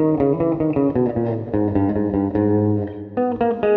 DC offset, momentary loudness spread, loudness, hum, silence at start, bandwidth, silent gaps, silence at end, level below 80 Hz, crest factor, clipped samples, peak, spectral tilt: under 0.1%; 5 LU; -20 LUFS; none; 0 s; 4.1 kHz; none; 0 s; -46 dBFS; 14 dB; under 0.1%; -6 dBFS; -12 dB/octave